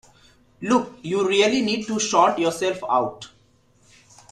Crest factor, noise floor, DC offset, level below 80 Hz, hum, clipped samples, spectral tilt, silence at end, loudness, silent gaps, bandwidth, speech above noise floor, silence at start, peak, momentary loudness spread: 18 dB; -59 dBFS; under 0.1%; -62 dBFS; none; under 0.1%; -3.5 dB/octave; 1.05 s; -21 LUFS; none; 13.5 kHz; 37 dB; 0.6 s; -4 dBFS; 12 LU